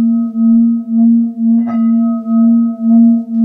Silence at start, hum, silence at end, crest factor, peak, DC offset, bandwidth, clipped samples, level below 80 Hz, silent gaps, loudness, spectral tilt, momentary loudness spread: 0 s; none; 0 s; 8 dB; -2 dBFS; under 0.1%; 2.1 kHz; under 0.1%; -64 dBFS; none; -11 LUFS; -12 dB/octave; 4 LU